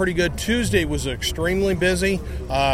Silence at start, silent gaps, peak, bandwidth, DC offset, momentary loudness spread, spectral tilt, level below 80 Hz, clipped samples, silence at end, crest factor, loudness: 0 s; none; -6 dBFS; 16 kHz; 0.4%; 5 LU; -4.5 dB/octave; -32 dBFS; under 0.1%; 0 s; 14 dB; -22 LUFS